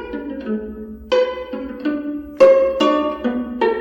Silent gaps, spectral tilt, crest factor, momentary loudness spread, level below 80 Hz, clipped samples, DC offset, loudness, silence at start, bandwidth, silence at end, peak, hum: none; -5.5 dB/octave; 18 dB; 16 LU; -46 dBFS; under 0.1%; under 0.1%; -18 LUFS; 0 s; 17 kHz; 0 s; 0 dBFS; none